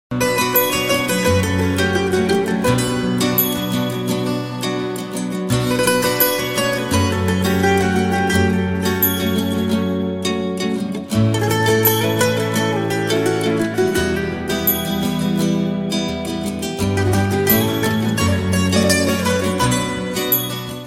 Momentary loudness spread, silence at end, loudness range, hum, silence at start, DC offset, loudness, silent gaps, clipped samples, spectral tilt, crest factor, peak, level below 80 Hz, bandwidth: 6 LU; 0 s; 2 LU; none; 0.1 s; 0.2%; -18 LUFS; none; under 0.1%; -5 dB/octave; 16 dB; -2 dBFS; -42 dBFS; 17 kHz